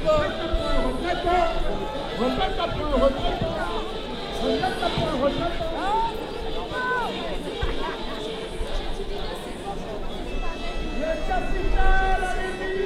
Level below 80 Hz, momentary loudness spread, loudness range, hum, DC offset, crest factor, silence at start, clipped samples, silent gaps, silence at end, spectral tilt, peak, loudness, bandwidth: -28 dBFS; 9 LU; 6 LU; none; under 0.1%; 16 dB; 0 s; under 0.1%; none; 0 s; -5.5 dB/octave; -8 dBFS; -27 LUFS; 11.5 kHz